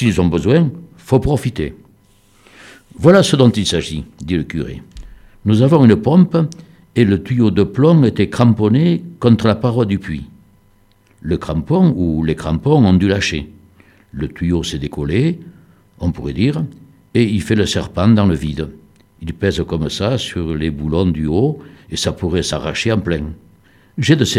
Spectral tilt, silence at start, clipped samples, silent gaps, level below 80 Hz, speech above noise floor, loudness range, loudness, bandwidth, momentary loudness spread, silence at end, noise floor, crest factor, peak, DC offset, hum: -6.5 dB/octave; 0 s; under 0.1%; none; -36 dBFS; 38 dB; 6 LU; -16 LUFS; 13 kHz; 15 LU; 0 s; -52 dBFS; 16 dB; 0 dBFS; under 0.1%; none